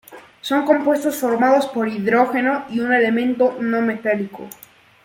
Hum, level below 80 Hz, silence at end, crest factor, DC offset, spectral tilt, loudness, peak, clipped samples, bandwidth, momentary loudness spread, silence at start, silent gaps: none; -66 dBFS; 0.55 s; 16 dB; under 0.1%; -5 dB/octave; -18 LUFS; -2 dBFS; under 0.1%; 17 kHz; 7 LU; 0.1 s; none